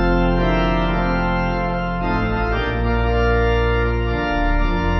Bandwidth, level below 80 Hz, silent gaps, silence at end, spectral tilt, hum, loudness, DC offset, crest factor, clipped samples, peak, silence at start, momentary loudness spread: 6 kHz; -22 dBFS; none; 0 s; -8 dB/octave; none; -19 LUFS; under 0.1%; 12 dB; under 0.1%; -6 dBFS; 0 s; 3 LU